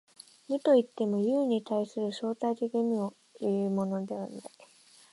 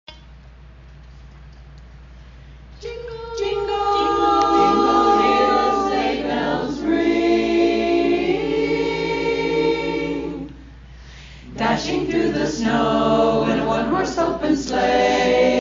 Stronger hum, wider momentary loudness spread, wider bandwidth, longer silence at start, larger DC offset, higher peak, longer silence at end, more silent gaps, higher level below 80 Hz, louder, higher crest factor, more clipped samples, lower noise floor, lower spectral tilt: neither; about the same, 13 LU vs 11 LU; first, 11.5 kHz vs 7.4 kHz; first, 0.5 s vs 0.1 s; neither; second, -12 dBFS vs -4 dBFS; first, 0.65 s vs 0 s; neither; second, -78 dBFS vs -42 dBFS; second, -30 LUFS vs -19 LUFS; about the same, 18 dB vs 16 dB; neither; first, -58 dBFS vs -42 dBFS; first, -7 dB/octave vs -3.5 dB/octave